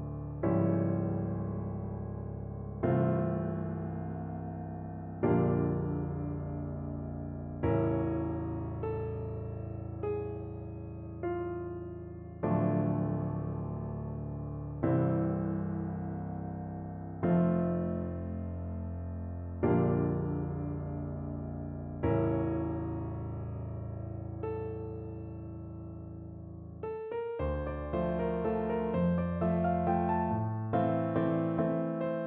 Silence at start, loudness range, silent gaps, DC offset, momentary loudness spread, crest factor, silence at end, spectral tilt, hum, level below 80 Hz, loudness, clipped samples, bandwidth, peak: 0 s; 7 LU; none; under 0.1%; 11 LU; 16 dB; 0 s; -10 dB/octave; none; -48 dBFS; -34 LUFS; under 0.1%; 3.7 kHz; -18 dBFS